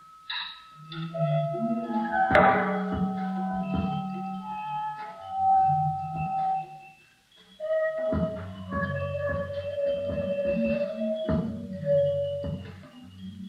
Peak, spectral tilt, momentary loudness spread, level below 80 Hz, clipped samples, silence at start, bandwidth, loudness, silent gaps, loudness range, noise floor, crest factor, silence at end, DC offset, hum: -4 dBFS; -8 dB/octave; 15 LU; -50 dBFS; under 0.1%; 0 s; 10 kHz; -28 LUFS; none; 5 LU; -58 dBFS; 24 dB; 0 s; under 0.1%; none